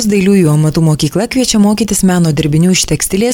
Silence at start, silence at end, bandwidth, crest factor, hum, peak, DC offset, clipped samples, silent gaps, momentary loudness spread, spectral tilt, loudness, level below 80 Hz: 0 s; 0 s; 17.5 kHz; 10 dB; none; 0 dBFS; under 0.1%; under 0.1%; none; 4 LU; -5 dB/octave; -11 LUFS; -32 dBFS